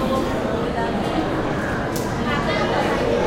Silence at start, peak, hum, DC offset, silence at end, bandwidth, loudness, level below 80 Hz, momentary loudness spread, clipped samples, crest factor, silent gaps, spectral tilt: 0 s; -8 dBFS; none; under 0.1%; 0 s; 16 kHz; -22 LUFS; -36 dBFS; 3 LU; under 0.1%; 14 dB; none; -5.5 dB/octave